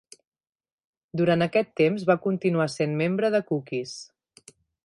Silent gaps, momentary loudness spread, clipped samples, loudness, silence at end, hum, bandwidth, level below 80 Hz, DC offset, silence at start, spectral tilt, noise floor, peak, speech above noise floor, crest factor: none; 10 LU; under 0.1%; -25 LUFS; 0.8 s; none; 11.5 kHz; -68 dBFS; under 0.1%; 1.15 s; -6.5 dB/octave; -55 dBFS; -8 dBFS; 31 dB; 20 dB